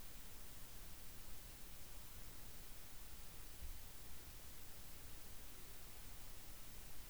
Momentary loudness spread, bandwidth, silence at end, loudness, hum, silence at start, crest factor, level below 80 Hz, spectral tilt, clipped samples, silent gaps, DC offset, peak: 1 LU; over 20 kHz; 0 s; -54 LUFS; none; 0 s; 14 dB; -58 dBFS; -2.5 dB/octave; under 0.1%; none; 0.2%; -38 dBFS